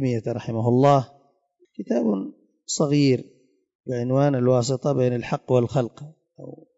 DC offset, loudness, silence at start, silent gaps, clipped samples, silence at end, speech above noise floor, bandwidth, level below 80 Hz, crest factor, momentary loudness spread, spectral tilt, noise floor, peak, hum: under 0.1%; -22 LUFS; 0 s; 3.75-3.79 s; under 0.1%; 0.25 s; 42 dB; 8 kHz; -62 dBFS; 16 dB; 20 LU; -6.5 dB/octave; -63 dBFS; -6 dBFS; none